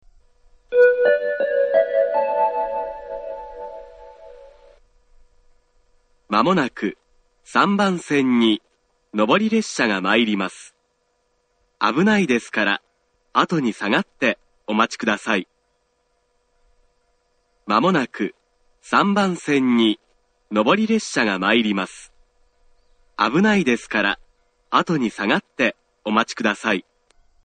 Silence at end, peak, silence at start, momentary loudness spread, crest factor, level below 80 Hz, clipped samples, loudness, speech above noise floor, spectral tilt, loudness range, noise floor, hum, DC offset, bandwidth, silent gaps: 0.65 s; 0 dBFS; 0.7 s; 12 LU; 20 dB; -58 dBFS; under 0.1%; -20 LUFS; 49 dB; -5 dB/octave; 6 LU; -68 dBFS; none; under 0.1%; 9.4 kHz; none